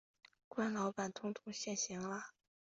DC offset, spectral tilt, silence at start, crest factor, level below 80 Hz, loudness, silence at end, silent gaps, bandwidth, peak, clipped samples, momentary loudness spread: under 0.1%; -4 dB/octave; 0.5 s; 16 dB; -82 dBFS; -42 LUFS; 0.5 s; none; 8 kHz; -26 dBFS; under 0.1%; 9 LU